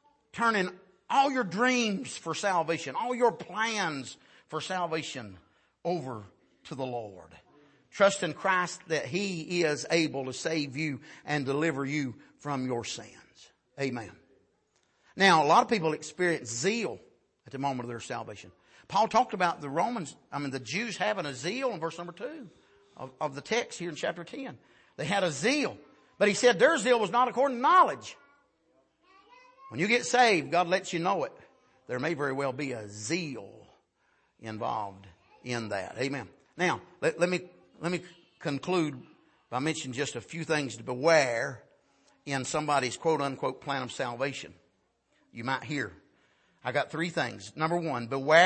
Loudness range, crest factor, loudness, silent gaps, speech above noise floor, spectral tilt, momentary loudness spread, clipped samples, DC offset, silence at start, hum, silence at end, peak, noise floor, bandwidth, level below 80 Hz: 9 LU; 24 dB; -29 LUFS; none; 43 dB; -4 dB/octave; 17 LU; under 0.1%; under 0.1%; 0.35 s; none; 0 s; -8 dBFS; -72 dBFS; 8.8 kHz; -74 dBFS